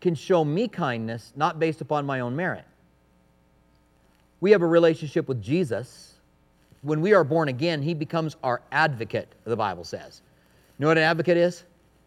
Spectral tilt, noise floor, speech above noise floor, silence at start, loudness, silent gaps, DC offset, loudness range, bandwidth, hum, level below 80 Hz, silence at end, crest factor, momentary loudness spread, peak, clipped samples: -6.5 dB/octave; -61 dBFS; 37 dB; 0 s; -24 LUFS; none; under 0.1%; 5 LU; 13 kHz; none; -66 dBFS; 0.45 s; 22 dB; 12 LU; -4 dBFS; under 0.1%